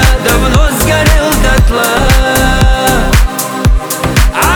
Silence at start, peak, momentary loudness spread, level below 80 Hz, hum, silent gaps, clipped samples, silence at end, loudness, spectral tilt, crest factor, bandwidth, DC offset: 0 s; 0 dBFS; 4 LU; -12 dBFS; none; none; under 0.1%; 0 s; -10 LUFS; -4.5 dB/octave; 8 dB; 20 kHz; under 0.1%